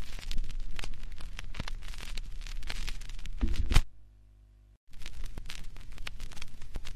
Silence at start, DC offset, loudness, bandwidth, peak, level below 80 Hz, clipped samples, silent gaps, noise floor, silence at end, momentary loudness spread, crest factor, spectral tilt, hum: 0 s; under 0.1%; -40 LUFS; 12.5 kHz; -6 dBFS; -36 dBFS; under 0.1%; 4.77-4.87 s; -57 dBFS; 0 s; 16 LU; 24 dB; -4 dB/octave; 50 Hz at -60 dBFS